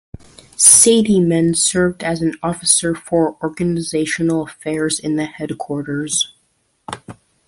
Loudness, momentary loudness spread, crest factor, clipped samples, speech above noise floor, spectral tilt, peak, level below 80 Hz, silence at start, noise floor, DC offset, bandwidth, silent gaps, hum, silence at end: -15 LUFS; 16 LU; 18 dB; under 0.1%; 47 dB; -3.5 dB/octave; 0 dBFS; -50 dBFS; 0.6 s; -63 dBFS; under 0.1%; 16 kHz; none; none; 0.35 s